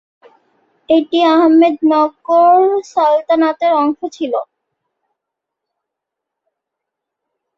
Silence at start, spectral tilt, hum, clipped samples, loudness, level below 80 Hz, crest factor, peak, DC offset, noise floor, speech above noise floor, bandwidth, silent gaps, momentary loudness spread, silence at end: 0.9 s; -4.5 dB/octave; none; under 0.1%; -13 LUFS; -64 dBFS; 14 dB; -2 dBFS; under 0.1%; -80 dBFS; 68 dB; 7.4 kHz; none; 11 LU; 3.15 s